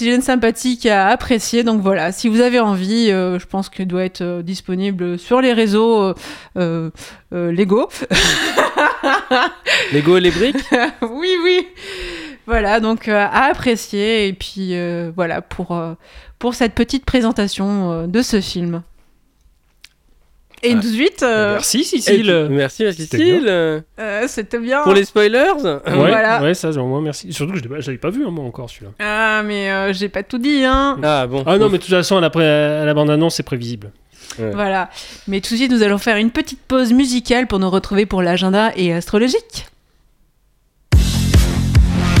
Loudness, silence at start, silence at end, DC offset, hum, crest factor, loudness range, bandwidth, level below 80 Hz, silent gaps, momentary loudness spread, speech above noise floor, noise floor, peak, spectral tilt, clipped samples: -16 LUFS; 0 s; 0 s; under 0.1%; none; 16 dB; 5 LU; 17 kHz; -30 dBFS; none; 11 LU; 42 dB; -58 dBFS; 0 dBFS; -5 dB/octave; under 0.1%